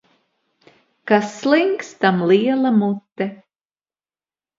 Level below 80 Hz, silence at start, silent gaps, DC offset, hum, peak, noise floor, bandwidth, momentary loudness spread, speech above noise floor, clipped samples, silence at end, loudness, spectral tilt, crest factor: -70 dBFS; 1.05 s; none; under 0.1%; none; -2 dBFS; under -90 dBFS; 7.6 kHz; 11 LU; over 73 dB; under 0.1%; 1.25 s; -18 LUFS; -6.5 dB/octave; 20 dB